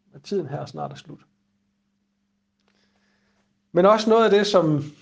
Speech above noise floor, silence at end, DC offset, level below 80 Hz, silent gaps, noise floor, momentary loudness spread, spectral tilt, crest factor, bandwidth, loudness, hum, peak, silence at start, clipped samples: 52 dB; 0.1 s; under 0.1%; -70 dBFS; none; -73 dBFS; 17 LU; -6 dB/octave; 22 dB; 9.2 kHz; -20 LUFS; none; -2 dBFS; 0.15 s; under 0.1%